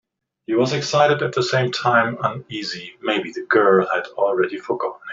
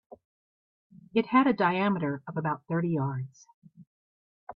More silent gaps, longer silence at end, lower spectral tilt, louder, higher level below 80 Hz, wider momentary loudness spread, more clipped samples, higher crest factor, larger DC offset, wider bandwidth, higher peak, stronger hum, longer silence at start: second, none vs 0.25-0.90 s, 3.54-3.62 s, 3.87-4.47 s; about the same, 0 s vs 0.05 s; second, -5 dB/octave vs -8 dB/octave; first, -20 LUFS vs -28 LUFS; first, -64 dBFS vs -72 dBFS; about the same, 11 LU vs 9 LU; neither; about the same, 18 dB vs 20 dB; neither; first, 7.8 kHz vs 6.6 kHz; first, -2 dBFS vs -10 dBFS; neither; first, 0.5 s vs 0.1 s